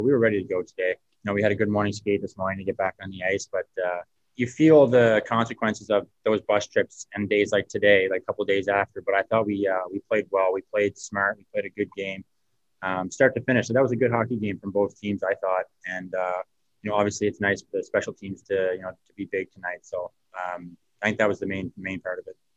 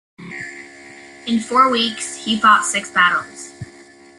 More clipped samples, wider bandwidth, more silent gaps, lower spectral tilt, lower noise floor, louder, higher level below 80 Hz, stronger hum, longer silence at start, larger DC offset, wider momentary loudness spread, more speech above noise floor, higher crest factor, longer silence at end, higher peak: neither; second, 8.4 kHz vs 12.5 kHz; neither; first, -5.5 dB/octave vs -2 dB/octave; first, -68 dBFS vs -44 dBFS; second, -25 LUFS vs -16 LUFS; about the same, -58 dBFS vs -62 dBFS; neither; second, 0 s vs 0.2 s; neither; second, 13 LU vs 23 LU; first, 43 dB vs 27 dB; about the same, 20 dB vs 18 dB; second, 0.25 s vs 0.5 s; second, -6 dBFS vs -2 dBFS